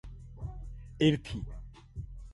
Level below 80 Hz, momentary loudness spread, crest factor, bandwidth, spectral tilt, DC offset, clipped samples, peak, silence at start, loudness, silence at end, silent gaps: -46 dBFS; 20 LU; 22 dB; 11.5 kHz; -7 dB/octave; under 0.1%; under 0.1%; -12 dBFS; 0.05 s; -32 LUFS; 0 s; none